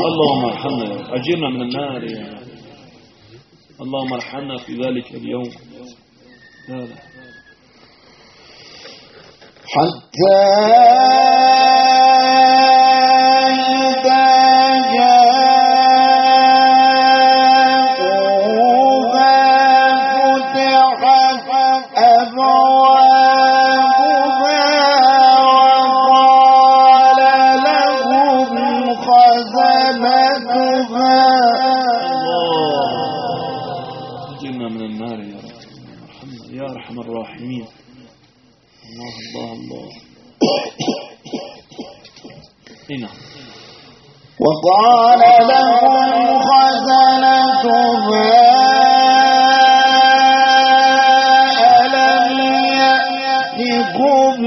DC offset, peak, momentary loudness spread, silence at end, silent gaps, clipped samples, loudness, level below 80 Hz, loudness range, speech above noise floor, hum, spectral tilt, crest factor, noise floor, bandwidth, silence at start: under 0.1%; 0 dBFS; 19 LU; 0 s; none; under 0.1%; -11 LUFS; -62 dBFS; 19 LU; 38 dB; none; -1 dB/octave; 12 dB; -52 dBFS; 6.4 kHz; 0 s